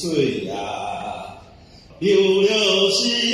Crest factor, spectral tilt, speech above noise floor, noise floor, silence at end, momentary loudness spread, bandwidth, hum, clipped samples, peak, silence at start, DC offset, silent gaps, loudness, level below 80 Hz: 16 dB; -3.5 dB/octave; 27 dB; -45 dBFS; 0 s; 15 LU; 13 kHz; none; under 0.1%; -6 dBFS; 0 s; under 0.1%; none; -19 LUFS; -54 dBFS